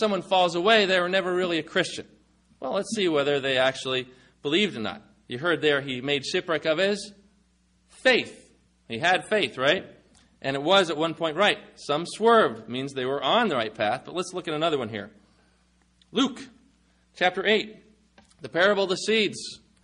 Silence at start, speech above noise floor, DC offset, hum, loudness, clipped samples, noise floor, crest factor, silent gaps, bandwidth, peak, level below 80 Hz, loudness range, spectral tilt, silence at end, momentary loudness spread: 0 s; 40 dB; under 0.1%; none; -24 LUFS; under 0.1%; -65 dBFS; 18 dB; none; 10.5 kHz; -8 dBFS; -66 dBFS; 5 LU; -4 dB/octave; 0.25 s; 14 LU